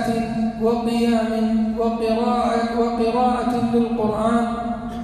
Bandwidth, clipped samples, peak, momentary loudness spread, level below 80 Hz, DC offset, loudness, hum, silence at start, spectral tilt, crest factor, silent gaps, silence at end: 13 kHz; under 0.1%; -8 dBFS; 3 LU; -42 dBFS; under 0.1%; -20 LUFS; none; 0 s; -6.5 dB/octave; 12 dB; none; 0 s